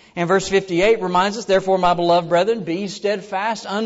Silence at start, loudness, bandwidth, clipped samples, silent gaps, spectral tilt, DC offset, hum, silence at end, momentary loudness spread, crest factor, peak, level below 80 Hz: 0.15 s; -19 LUFS; 8 kHz; under 0.1%; none; -5 dB/octave; under 0.1%; none; 0 s; 7 LU; 14 dB; -6 dBFS; -48 dBFS